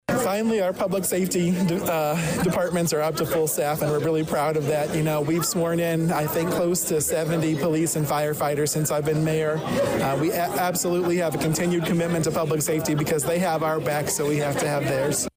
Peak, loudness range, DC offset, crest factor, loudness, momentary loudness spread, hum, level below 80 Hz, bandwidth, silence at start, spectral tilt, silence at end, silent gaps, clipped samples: -14 dBFS; 0 LU; under 0.1%; 8 dB; -23 LUFS; 1 LU; none; -52 dBFS; 16 kHz; 0.1 s; -5 dB/octave; 0.05 s; none; under 0.1%